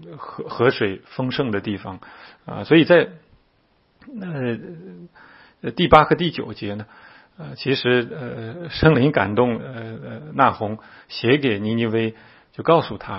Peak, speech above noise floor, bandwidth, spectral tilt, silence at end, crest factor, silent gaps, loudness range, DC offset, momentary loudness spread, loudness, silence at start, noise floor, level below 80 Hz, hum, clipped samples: 0 dBFS; 41 dB; 5.8 kHz; -8.5 dB/octave; 0 s; 22 dB; none; 2 LU; under 0.1%; 21 LU; -20 LUFS; 0 s; -62 dBFS; -46 dBFS; none; under 0.1%